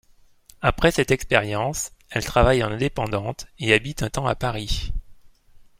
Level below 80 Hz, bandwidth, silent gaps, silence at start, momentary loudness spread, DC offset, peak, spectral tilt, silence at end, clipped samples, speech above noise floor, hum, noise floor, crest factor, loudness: -34 dBFS; 16.5 kHz; none; 0.6 s; 10 LU; under 0.1%; -2 dBFS; -4.5 dB/octave; 0.2 s; under 0.1%; 31 dB; none; -53 dBFS; 22 dB; -23 LUFS